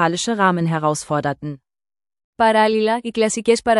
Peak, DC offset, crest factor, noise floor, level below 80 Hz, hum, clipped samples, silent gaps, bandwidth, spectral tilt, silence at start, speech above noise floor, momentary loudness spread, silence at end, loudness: -2 dBFS; under 0.1%; 16 dB; under -90 dBFS; -56 dBFS; none; under 0.1%; 2.24-2.33 s; 12 kHz; -4.5 dB/octave; 0 s; over 72 dB; 11 LU; 0 s; -18 LUFS